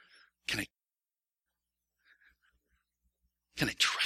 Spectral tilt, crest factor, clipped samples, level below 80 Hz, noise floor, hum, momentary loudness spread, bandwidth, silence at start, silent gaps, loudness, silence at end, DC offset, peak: -2 dB/octave; 26 dB; under 0.1%; -66 dBFS; under -90 dBFS; none; 15 LU; 16.5 kHz; 0.5 s; none; -34 LUFS; 0 s; under 0.1%; -14 dBFS